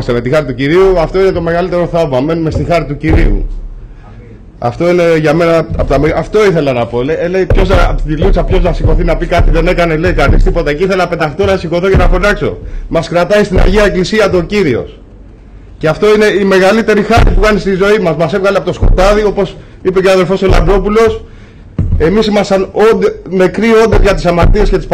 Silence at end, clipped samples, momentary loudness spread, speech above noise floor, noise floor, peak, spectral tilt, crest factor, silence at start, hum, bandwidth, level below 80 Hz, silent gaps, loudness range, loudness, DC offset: 0 s; under 0.1%; 6 LU; 24 dB; -33 dBFS; -2 dBFS; -6.5 dB/octave; 6 dB; 0 s; none; 10.5 kHz; -16 dBFS; none; 3 LU; -10 LUFS; under 0.1%